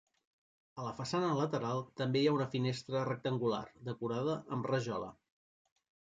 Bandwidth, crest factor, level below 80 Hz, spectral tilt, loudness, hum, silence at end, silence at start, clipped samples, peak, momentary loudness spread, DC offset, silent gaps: 9.2 kHz; 18 dB; -72 dBFS; -6.5 dB/octave; -36 LUFS; none; 1 s; 0.75 s; under 0.1%; -18 dBFS; 11 LU; under 0.1%; none